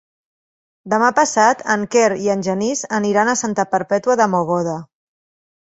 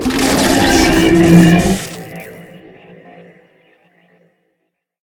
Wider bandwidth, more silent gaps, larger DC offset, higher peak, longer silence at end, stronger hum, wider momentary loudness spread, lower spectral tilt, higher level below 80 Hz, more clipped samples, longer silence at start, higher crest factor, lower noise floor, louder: second, 8.2 kHz vs 18.5 kHz; neither; neither; about the same, -2 dBFS vs 0 dBFS; second, 0.9 s vs 2.6 s; neither; second, 6 LU vs 23 LU; about the same, -4 dB/octave vs -5 dB/octave; second, -62 dBFS vs -32 dBFS; second, under 0.1% vs 0.1%; first, 0.85 s vs 0 s; about the same, 18 dB vs 14 dB; first, under -90 dBFS vs -70 dBFS; second, -17 LUFS vs -10 LUFS